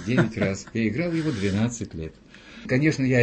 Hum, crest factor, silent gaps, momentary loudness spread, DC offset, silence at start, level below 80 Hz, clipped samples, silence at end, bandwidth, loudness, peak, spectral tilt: none; 18 dB; none; 16 LU; under 0.1%; 0 s; -50 dBFS; under 0.1%; 0 s; 8.8 kHz; -25 LUFS; -6 dBFS; -6.5 dB/octave